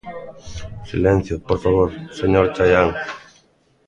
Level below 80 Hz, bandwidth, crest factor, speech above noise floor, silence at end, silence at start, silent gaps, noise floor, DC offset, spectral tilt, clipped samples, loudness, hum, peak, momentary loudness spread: -36 dBFS; 8.8 kHz; 18 dB; 40 dB; 0.7 s; 0.05 s; none; -58 dBFS; under 0.1%; -7 dB/octave; under 0.1%; -18 LUFS; none; 0 dBFS; 20 LU